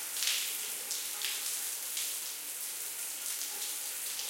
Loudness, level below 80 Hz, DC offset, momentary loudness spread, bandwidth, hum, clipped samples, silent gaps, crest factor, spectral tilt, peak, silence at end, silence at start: -34 LUFS; -82 dBFS; under 0.1%; 6 LU; 17 kHz; none; under 0.1%; none; 24 dB; 3.5 dB/octave; -12 dBFS; 0 s; 0 s